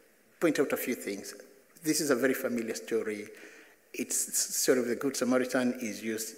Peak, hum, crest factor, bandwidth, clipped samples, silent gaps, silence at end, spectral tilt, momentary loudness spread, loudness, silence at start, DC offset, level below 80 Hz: -12 dBFS; none; 20 dB; 16 kHz; under 0.1%; none; 0 s; -3 dB/octave; 13 LU; -30 LUFS; 0.4 s; under 0.1%; -82 dBFS